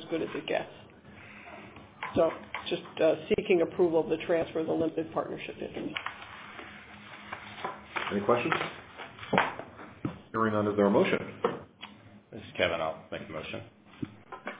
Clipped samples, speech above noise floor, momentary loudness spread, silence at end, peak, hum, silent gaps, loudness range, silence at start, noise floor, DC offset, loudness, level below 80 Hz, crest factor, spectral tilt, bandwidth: under 0.1%; 22 dB; 20 LU; 0 s; -6 dBFS; none; none; 7 LU; 0 s; -51 dBFS; under 0.1%; -30 LUFS; -62 dBFS; 26 dB; -4 dB/octave; 4 kHz